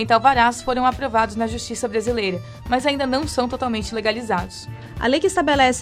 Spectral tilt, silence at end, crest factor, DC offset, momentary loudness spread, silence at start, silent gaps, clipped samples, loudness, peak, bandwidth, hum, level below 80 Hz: -4 dB/octave; 0 s; 18 dB; under 0.1%; 9 LU; 0 s; none; under 0.1%; -20 LUFS; -2 dBFS; 15 kHz; none; -40 dBFS